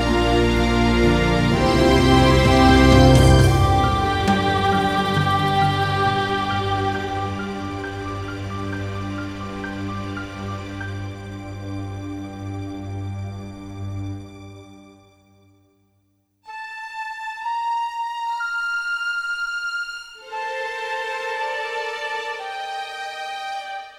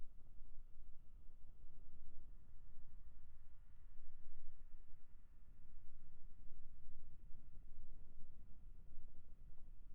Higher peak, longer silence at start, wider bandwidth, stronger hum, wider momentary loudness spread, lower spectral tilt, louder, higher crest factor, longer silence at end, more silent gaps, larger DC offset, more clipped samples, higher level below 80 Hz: first, 0 dBFS vs -30 dBFS; about the same, 0 s vs 0 s; first, 15 kHz vs 0.7 kHz; neither; first, 17 LU vs 3 LU; second, -6 dB/octave vs -9.5 dB/octave; first, -21 LUFS vs -67 LUFS; first, 20 dB vs 10 dB; about the same, 0 s vs 0 s; neither; neither; neither; first, -30 dBFS vs -54 dBFS